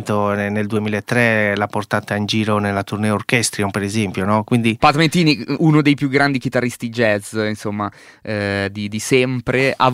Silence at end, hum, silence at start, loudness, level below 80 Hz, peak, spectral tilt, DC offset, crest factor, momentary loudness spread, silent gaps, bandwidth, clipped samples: 0 s; none; 0 s; -18 LUFS; -50 dBFS; 0 dBFS; -5 dB/octave; under 0.1%; 18 dB; 8 LU; none; 16 kHz; under 0.1%